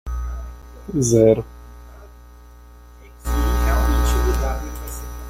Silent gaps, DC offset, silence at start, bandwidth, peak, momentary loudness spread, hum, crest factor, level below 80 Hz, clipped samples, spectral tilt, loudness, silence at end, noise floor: none; under 0.1%; 0.05 s; 16 kHz; -2 dBFS; 21 LU; 60 Hz at -30 dBFS; 18 dB; -24 dBFS; under 0.1%; -6 dB/octave; -20 LUFS; 0 s; -43 dBFS